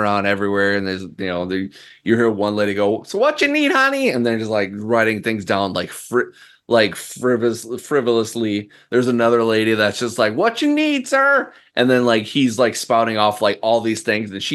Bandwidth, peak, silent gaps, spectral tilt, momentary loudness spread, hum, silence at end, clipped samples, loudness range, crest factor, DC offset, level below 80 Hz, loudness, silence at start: 12.5 kHz; 0 dBFS; none; -4.5 dB/octave; 8 LU; none; 0 s; under 0.1%; 3 LU; 18 dB; under 0.1%; -64 dBFS; -18 LUFS; 0 s